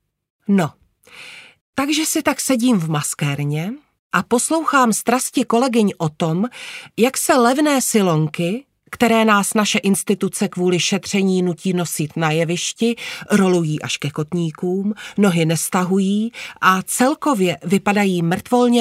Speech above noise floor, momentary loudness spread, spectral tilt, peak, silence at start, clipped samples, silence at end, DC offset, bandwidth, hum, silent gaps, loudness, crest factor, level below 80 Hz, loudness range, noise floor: 24 dB; 9 LU; -4.5 dB/octave; 0 dBFS; 0.5 s; under 0.1%; 0 s; under 0.1%; 16 kHz; none; 1.61-1.73 s, 3.99-4.10 s; -18 LUFS; 18 dB; -60 dBFS; 3 LU; -42 dBFS